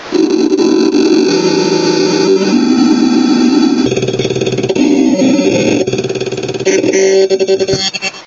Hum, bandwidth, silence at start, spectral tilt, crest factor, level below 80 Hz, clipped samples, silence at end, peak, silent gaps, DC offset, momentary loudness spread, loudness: none; 7.8 kHz; 0 s; -4.5 dB/octave; 10 dB; -48 dBFS; under 0.1%; 0 s; 0 dBFS; none; under 0.1%; 5 LU; -11 LUFS